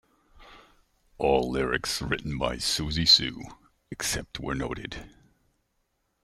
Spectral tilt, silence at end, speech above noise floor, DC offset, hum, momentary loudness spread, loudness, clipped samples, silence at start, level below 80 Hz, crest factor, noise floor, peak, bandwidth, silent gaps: -3 dB/octave; 1.15 s; 48 dB; under 0.1%; none; 21 LU; -26 LUFS; under 0.1%; 0.35 s; -46 dBFS; 22 dB; -75 dBFS; -6 dBFS; 16 kHz; none